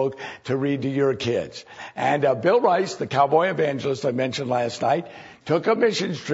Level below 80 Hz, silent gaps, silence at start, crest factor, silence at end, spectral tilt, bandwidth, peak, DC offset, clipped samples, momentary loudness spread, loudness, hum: -64 dBFS; none; 0 s; 16 dB; 0 s; -5.5 dB/octave; 8 kHz; -6 dBFS; under 0.1%; under 0.1%; 10 LU; -22 LUFS; none